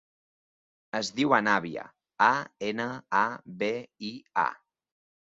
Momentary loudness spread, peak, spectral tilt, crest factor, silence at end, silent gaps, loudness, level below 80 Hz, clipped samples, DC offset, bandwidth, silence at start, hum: 14 LU; -6 dBFS; -4 dB/octave; 24 dB; 0.7 s; none; -28 LUFS; -74 dBFS; under 0.1%; under 0.1%; 8 kHz; 0.95 s; none